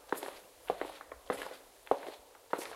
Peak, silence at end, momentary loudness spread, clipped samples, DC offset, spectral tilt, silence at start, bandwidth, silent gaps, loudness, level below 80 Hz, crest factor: -10 dBFS; 0 s; 14 LU; under 0.1%; under 0.1%; -3 dB/octave; 0 s; 16 kHz; none; -40 LUFS; -70 dBFS; 30 dB